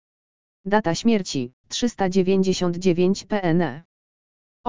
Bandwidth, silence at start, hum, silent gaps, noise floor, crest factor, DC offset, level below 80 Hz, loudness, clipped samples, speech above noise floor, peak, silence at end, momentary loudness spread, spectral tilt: 7.6 kHz; 0.65 s; none; 1.53-1.64 s, 3.85-4.64 s; under -90 dBFS; 18 dB; 1%; -52 dBFS; -22 LUFS; under 0.1%; over 69 dB; -4 dBFS; 0 s; 9 LU; -5.5 dB/octave